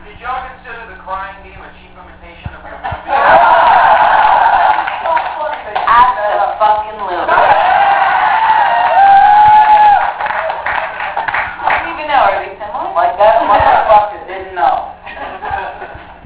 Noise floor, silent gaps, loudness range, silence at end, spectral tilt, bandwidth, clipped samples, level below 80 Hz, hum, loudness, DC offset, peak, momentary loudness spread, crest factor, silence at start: -36 dBFS; none; 5 LU; 0.15 s; -7 dB/octave; 4 kHz; 0.2%; -40 dBFS; none; -10 LUFS; under 0.1%; 0 dBFS; 18 LU; 12 dB; 0.05 s